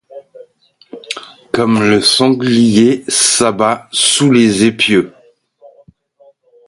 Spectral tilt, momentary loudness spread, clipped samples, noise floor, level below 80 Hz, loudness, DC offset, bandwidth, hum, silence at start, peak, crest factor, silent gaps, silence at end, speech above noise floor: -3.5 dB/octave; 15 LU; under 0.1%; -50 dBFS; -52 dBFS; -11 LUFS; under 0.1%; 11.5 kHz; none; 0.15 s; 0 dBFS; 14 dB; none; 1.6 s; 39 dB